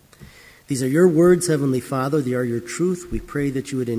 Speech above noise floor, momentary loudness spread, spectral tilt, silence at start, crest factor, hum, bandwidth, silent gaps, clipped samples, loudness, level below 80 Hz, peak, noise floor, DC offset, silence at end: 26 dB; 10 LU; -6.5 dB/octave; 0.2 s; 16 dB; none; 16 kHz; none; under 0.1%; -20 LUFS; -44 dBFS; -4 dBFS; -46 dBFS; under 0.1%; 0 s